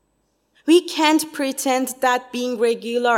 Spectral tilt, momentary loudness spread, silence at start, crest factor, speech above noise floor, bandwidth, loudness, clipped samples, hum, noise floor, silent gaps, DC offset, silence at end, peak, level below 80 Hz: -2 dB/octave; 7 LU; 0.65 s; 18 dB; 48 dB; 16.5 kHz; -20 LUFS; under 0.1%; none; -67 dBFS; none; under 0.1%; 0 s; -2 dBFS; -74 dBFS